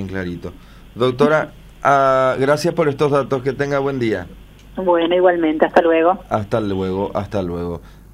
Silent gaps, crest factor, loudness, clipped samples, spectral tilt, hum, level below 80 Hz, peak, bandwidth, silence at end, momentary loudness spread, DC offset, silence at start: none; 16 dB; -18 LUFS; under 0.1%; -6.5 dB/octave; none; -44 dBFS; 0 dBFS; 15 kHz; 0.25 s; 13 LU; under 0.1%; 0 s